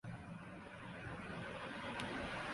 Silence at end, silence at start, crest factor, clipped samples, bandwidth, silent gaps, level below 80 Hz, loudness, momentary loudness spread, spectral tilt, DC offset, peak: 0 s; 0.05 s; 18 dB; under 0.1%; 11.5 kHz; none; -64 dBFS; -47 LUFS; 8 LU; -5 dB/octave; under 0.1%; -30 dBFS